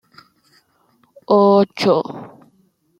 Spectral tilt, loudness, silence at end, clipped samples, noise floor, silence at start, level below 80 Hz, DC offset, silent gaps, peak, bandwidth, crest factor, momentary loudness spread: -7 dB/octave; -15 LUFS; 0.75 s; under 0.1%; -60 dBFS; 1.3 s; -66 dBFS; under 0.1%; none; -2 dBFS; 11.5 kHz; 18 dB; 17 LU